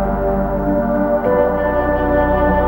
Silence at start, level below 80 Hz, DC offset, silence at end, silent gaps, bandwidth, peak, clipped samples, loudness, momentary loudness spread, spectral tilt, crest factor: 0 s; -26 dBFS; under 0.1%; 0 s; none; 16.5 kHz; -2 dBFS; under 0.1%; -16 LUFS; 3 LU; -10 dB/octave; 14 dB